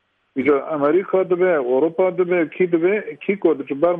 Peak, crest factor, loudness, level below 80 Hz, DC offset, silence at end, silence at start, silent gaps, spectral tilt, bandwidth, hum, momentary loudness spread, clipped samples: -4 dBFS; 14 dB; -19 LUFS; -66 dBFS; under 0.1%; 0 s; 0.35 s; none; -10 dB/octave; 3.7 kHz; none; 4 LU; under 0.1%